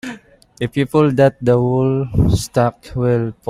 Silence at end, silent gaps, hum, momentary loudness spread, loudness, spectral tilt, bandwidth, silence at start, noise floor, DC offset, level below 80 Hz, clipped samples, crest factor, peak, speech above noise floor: 0 s; none; none; 8 LU; -16 LUFS; -7.5 dB/octave; 13.5 kHz; 0.05 s; -38 dBFS; under 0.1%; -34 dBFS; under 0.1%; 14 dB; -2 dBFS; 23 dB